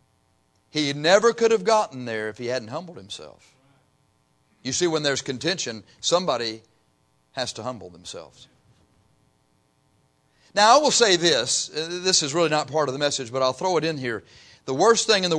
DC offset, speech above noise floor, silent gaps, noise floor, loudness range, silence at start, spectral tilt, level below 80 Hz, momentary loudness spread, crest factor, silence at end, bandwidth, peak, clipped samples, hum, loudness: under 0.1%; 43 dB; none; -66 dBFS; 14 LU; 0.75 s; -2.5 dB/octave; -68 dBFS; 20 LU; 20 dB; 0 s; 10.5 kHz; -4 dBFS; under 0.1%; none; -22 LUFS